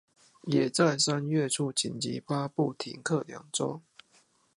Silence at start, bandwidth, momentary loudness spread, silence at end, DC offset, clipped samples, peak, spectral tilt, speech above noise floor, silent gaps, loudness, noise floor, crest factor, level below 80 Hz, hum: 0.45 s; 11.5 kHz; 10 LU; 0.8 s; under 0.1%; under 0.1%; -10 dBFS; -4 dB/octave; 36 dB; none; -29 LUFS; -66 dBFS; 20 dB; -74 dBFS; none